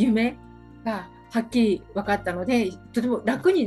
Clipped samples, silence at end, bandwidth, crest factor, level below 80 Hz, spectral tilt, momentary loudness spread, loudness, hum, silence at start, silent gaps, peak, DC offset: under 0.1%; 0 s; 12.5 kHz; 16 dB; -52 dBFS; -6 dB/octave; 9 LU; -25 LUFS; none; 0 s; none; -8 dBFS; under 0.1%